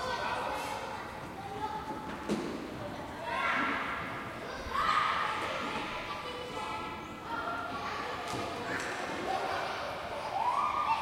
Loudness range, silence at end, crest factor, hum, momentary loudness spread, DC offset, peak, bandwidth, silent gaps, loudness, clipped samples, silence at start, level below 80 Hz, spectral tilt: 4 LU; 0 s; 18 dB; none; 10 LU; under 0.1%; -16 dBFS; 16.5 kHz; none; -35 LUFS; under 0.1%; 0 s; -58 dBFS; -4 dB/octave